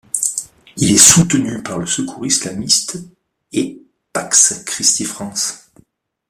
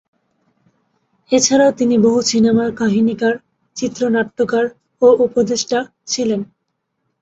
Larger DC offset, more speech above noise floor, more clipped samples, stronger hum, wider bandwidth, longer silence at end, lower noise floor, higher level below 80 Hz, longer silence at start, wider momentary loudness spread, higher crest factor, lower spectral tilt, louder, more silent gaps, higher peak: neither; second, 38 dB vs 58 dB; first, 0.1% vs under 0.1%; neither; first, 16 kHz vs 8 kHz; about the same, 0.75 s vs 0.8 s; second, -53 dBFS vs -72 dBFS; first, -48 dBFS vs -56 dBFS; second, 0.15 s vs 1.3 s; first, 18 LU vs 11 LU; about the same, 18 dB vs 16 dB; second, -2.5 dB/octave vs -4 dB/octave; first, -13 LUFS vs -16 LUFS; neither; about the same, 0 dBFS vs -2 dBFS